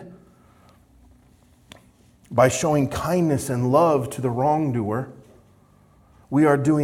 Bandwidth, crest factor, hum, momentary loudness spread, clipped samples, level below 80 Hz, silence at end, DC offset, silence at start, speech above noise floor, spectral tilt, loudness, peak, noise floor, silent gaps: 16 kHz; 20 dB; none; 9 LU; under 0.1%; -54 dBFS; 0 s; under 0.1%; 0 s; 35 dB; -6.5 dB/octave; -21 LUFS; -4 dBFS; -55 dBFS; none